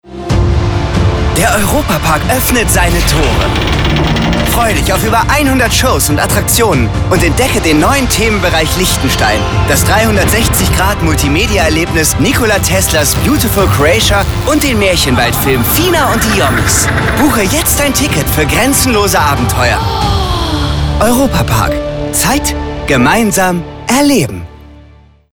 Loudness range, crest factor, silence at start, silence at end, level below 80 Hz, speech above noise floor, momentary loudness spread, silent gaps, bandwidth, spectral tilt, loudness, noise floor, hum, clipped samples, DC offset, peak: 2 LU; 10 dB; 0.05 s; 0.5 s; -18 dBFS; 30 dB; 4 LU; none; over 20 kHz; -4 dB/octave; -10 LUFS; -40 dBFS; none; under 0.1%; under 0.1%; 0 dBFS